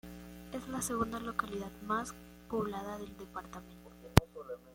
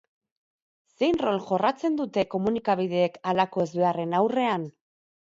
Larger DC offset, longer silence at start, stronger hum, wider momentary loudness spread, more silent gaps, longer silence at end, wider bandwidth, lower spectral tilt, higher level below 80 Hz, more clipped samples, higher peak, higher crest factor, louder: neither; second, 0.05 s vs 1 s; first, 60 Hz at -55 dBFS vs none; first, 20 LU vs 3 LU; neither; second, 0 s vs 0.6 s; first, 16.5 kHz vs 7.8 kHz; second, -5 dB/octave vs -7 dB/octave; first, -48 dBFS vs -64 dBFS; neither; first, -4 dBFS vs -8 dBFS; first, 34 dB vs 18 dB; second, -37 LUFS vs -26 LUFS